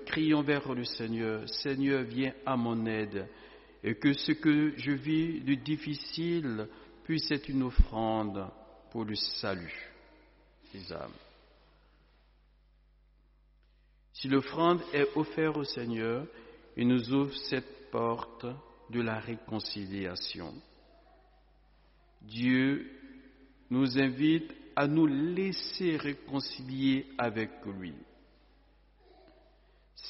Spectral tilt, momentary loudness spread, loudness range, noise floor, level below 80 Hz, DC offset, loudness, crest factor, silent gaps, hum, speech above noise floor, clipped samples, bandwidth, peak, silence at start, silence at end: -4.5 dB/octave; 16 LU; 9 LU; -64 dBFS; -44 dBFS; under 0.1%; -32 LUFS; 22 dB; none; none; 33 dB; under 0.1%; 6 kHz; -10 dBFS; 0 s; 0 s